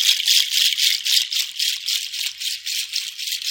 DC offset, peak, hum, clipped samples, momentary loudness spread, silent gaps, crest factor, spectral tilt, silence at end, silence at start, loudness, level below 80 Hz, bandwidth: under 0.1%; 0 dBFS; none; under 0.1%; 10 LU; none; 20 dB; 8.5 dB/octave; 0 s; 0 s; -18 LUFS; -84 dBFS; 17 kHz